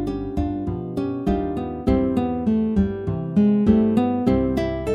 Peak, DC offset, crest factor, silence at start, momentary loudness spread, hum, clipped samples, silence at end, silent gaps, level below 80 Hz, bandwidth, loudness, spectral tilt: -6 dBFS; under 0.1%; 16 dB; 0 s; 9 LU; none; under 0.1%; 0 s; none; -34 dBFS; 9 kHz; -22 LUFS; -9.5 dB/octave